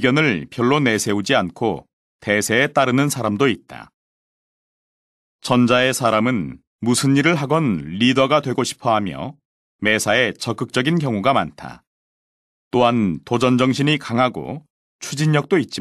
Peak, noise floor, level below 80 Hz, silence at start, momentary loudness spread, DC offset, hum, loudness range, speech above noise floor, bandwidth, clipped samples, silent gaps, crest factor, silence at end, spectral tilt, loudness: -2 dBFS; under -90 dBFS; -56 dBFS; 0 s; 13 LU; under 0.1%; none; 3 LU; over 72 dB; 12.5 kHz; under 0.1%; 1.93-2.19 s, 3.94-5.39 s, 6.67-6.79 s, 9.45-9.79 s, 11.87-12.71 s, 14.70-14.99 s; 16 dB; 0 s; -5 dB/octave; -18 LUFS